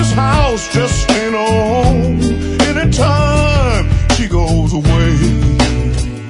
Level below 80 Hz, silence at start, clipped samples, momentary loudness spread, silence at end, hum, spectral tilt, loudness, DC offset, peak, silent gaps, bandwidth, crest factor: -18 dBFS; 0 s; under 0.1%; 3 LU; 0 s; none; -5.5 dB/octave; -13 LUFS; under 0.1%; 0 dBFS; none; 11 kHz; 12 dB